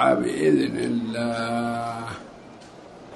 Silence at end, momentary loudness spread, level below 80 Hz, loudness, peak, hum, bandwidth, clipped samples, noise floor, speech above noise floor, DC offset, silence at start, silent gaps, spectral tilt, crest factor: 0 s; 24 LU; -60 dBFS; -24 LUFS; -8 dBFS; none; 11.5 kHz; under 0.1%; -44 dBFS; 21 dB; under 0.1%; 0 s; none; -6 dB/octave; 18 dB